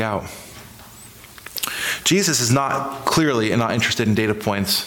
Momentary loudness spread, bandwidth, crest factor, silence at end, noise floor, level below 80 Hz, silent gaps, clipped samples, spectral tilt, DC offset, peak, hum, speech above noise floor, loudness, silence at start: 23 LU; 19 kHz; 16 dB; 0 s; -42 dBFS; -52 dBFS; none; under 0.1%; -3.5 dB/octave; under 0.1%; -6 dBFS; none; 23 dB; -19 LUFS; 0 s